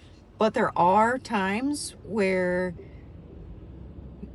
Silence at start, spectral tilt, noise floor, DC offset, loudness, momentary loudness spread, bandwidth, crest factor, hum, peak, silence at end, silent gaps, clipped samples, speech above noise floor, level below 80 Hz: 0.4 s; -5.5 dB/octave; -44 dBFS; under 0.1%; -25 LUFS; 24 LU; 13.5 kHz; 18 dB; none; -8 dBFS; 0 s; none; under 0.1%; 20 dB; -50 dBFS